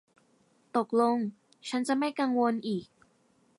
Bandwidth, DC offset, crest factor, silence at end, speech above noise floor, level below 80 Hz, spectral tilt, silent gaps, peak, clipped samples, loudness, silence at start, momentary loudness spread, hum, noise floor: 11.5 kHz; under 0.1%; 18 dB; 0.75 s; 39 dB; -80 dBFS; -5.5 dB/octave; none; -14 dBFS; under 0.1%; -30 LUFS; 0.75 s; 10 LU; none; -67 dBFS